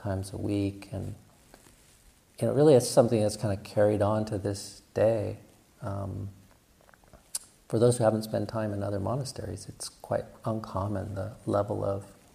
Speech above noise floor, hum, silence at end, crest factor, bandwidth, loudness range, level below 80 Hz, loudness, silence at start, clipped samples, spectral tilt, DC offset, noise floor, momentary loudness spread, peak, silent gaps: 32 dB; none; 0.2 s; 22 dB; 15.5 kHz; 8 LU; -60 dBFS; -29 LUFS; 0 s; under 0.1%; -6.5 dB/octave; under 0.1%; -60 dBFS; 15 LU; -8 dBFS; none